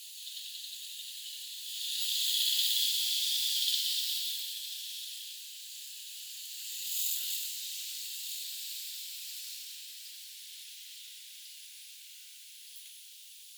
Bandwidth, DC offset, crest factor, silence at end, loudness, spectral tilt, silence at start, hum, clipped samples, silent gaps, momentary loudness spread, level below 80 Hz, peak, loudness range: over 20 kHz; under 0.1%; 24 dB; 0 s; -33 LUFS; 12 dB/octave; 0 s; none; under 0.1%; none; 19 LU; under -90 dBFS; -14 dBFS; 16 LU